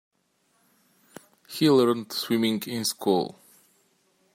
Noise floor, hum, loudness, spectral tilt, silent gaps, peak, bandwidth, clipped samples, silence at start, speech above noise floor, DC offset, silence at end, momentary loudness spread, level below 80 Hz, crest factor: -70 dBFS; none; -25 LUFS; -4.5 dB/octave; none; -8 dBFS; 16.5 kHz; under 0.1%; 1.5 s; 46 dB; under 0.1%; 1.05 s; 9 LU; -74 dBFS; 18 dB